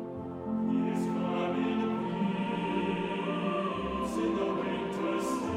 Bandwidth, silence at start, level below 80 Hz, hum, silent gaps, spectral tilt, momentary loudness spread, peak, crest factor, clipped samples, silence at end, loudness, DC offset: 14 kHz; 0 s; -58 dBFS; none; none; -6.5 dB/octave; 3 LU; -18 dBFS; 12 dB; under 0.1%; 0 s; -32 LUFS; under 0.1%